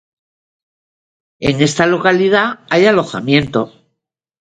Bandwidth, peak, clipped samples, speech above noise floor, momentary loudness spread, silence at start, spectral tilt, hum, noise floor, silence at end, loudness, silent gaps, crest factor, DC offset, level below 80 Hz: 9.4 kHz; 0 dBFS; under 0.1%; 63 dB; 8 LU; 1.4 s; -5 dB/octave; none; -76 dBFS; 0.75 s; -14 LUFS; none; 16 dB; under 0.1%; -46 dBFS